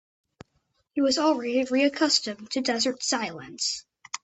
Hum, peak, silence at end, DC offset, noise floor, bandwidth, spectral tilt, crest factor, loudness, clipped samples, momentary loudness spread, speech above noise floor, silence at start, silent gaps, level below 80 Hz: none; -8 dBFS; 0.05 s; under 0.1%; -72 dBFS; 8.4 kHz; -2 dB/octave; 18 dB; -25 LUFS; under 0.1%; 11 LU; 47 dB; 0.95 s; none; -70 dBFS